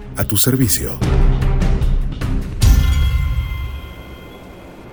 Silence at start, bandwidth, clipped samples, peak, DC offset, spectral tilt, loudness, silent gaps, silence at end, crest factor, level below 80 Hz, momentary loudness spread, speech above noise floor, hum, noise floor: 0 s; over 20 kHz; under 0.1%; 0 dBFS; under 0.1%; -5 dB/octave; -17 LUFS; none; 0 s; 16 dB; -18 dBFS; 22 LU; 22 dB; none; -36 dBFS